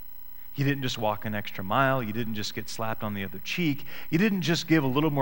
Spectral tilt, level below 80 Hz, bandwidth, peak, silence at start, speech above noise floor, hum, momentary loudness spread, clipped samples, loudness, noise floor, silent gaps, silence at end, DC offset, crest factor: -5.5 dB/octave; -56 dBFS; 17 kHz; -8 dBFS; 0 s; 20 dB; none; 10 LU; under 0.1%; -28 LUFS; -47 dBFS; none; 0 s; 1%; 18 dB